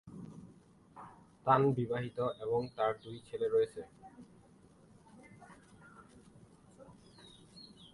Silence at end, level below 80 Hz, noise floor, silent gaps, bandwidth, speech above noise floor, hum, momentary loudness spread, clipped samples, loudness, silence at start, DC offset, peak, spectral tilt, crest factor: 0.05 s; -70 dBFS; -62 dBFS; none; 11.5 kHz; 29 dB; none; 27 LU; under 0.1%; -34 LUFS; 0.05 s; under 0.1%; -12 dBFS; -7.5 dB/octave; 26 dB